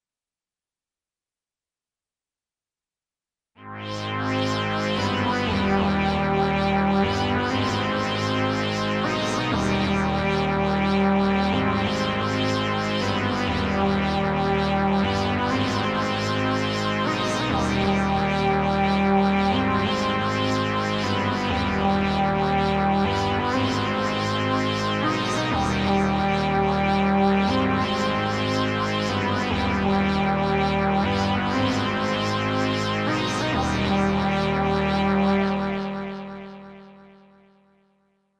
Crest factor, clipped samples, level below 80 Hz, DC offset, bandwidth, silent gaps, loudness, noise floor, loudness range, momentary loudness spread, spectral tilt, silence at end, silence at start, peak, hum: 16 dB; under 0.1%; -40 dBFS; under 0.1%; 10.5 kHz; none; -23 LUFS; under -90 dBFS; 3 LU; 3 LU; -6 dB/octave; 1.4 s; 3.6 s; -8 dBFS; none